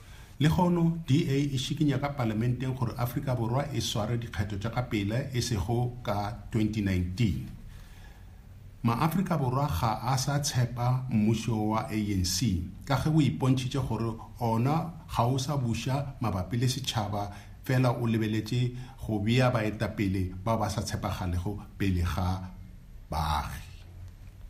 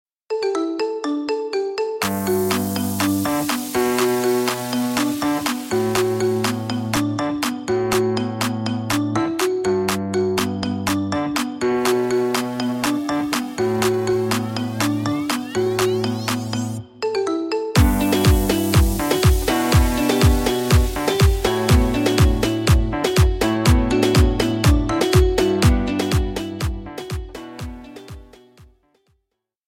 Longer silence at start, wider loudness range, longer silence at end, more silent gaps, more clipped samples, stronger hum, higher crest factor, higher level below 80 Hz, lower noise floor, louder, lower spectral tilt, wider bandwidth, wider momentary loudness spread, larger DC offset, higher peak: second, 0 s vs 0.3 s; about the same, 4 LU vs 4 LU; second, 0 s vs 1.05 s; neither; neither; neither; about the same, 18 dB vs 18 dB; second, -48 dBFS vs -26 dBFS; second, -48 dBFS vs -76 dBFS; second, -29 LUFS vs -20 LUFS; about the same, -6 dB/octave vs -5.5 dB/octave; about the same, 15.5 kHz vs 17 kHz; about the same, 8 LU vs 8 LU; neither; second, -12 dBFS vs -2 dBFS